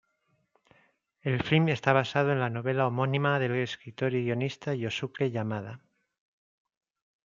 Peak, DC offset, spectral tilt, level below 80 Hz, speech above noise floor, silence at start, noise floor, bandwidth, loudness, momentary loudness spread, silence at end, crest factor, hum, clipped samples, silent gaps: -6 dBFS; under 0.1%; -7 dB/octave; -66 dBFS; 46 dB; 1.25 s; -74 dBFS; 7.4 kHz; -29 LUFS; 9 LU; 1.5 s; 24 dB; none; under 0.1%; none